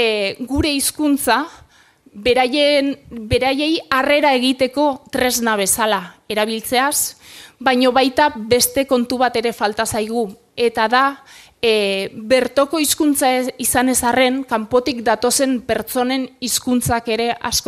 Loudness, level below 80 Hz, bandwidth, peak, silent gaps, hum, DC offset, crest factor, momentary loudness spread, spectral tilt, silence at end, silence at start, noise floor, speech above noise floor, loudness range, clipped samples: -17 LUFS; -44 dBFS; 15.5 kHz; 0 dBFS; none; none; under 0.1%; 16 dB; 6 LU; -2.5 dB/octave; 0 s; 0 s; -51 dBFS; 33 dB; 2 LU; under 0.1%